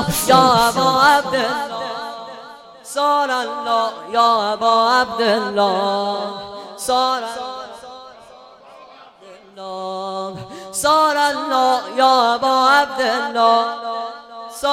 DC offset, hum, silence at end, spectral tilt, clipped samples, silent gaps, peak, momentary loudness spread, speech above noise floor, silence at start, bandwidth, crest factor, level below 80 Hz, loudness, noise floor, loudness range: under 0.1%; none; 0 s; -3 dB/octave; under 0.1%; none; -2 dBFS; 18 LU; 27 dB; 0 s; 16.5 kHz; 16 dB; -52 dBFS; -17 LUFS; -43 dBFS; 9 LU